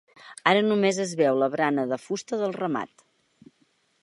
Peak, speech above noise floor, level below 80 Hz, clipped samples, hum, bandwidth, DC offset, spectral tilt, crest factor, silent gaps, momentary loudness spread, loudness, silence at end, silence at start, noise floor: -2 dBFS; 43 dB; -78 dBFS; under 0.1%; none; 11.5 kHz; under 0.1%; -4.5 dB/octave; 24 dB; none; 10 LU; -25 LUFS; 1.15 s; 0.25 s; -67 dBFS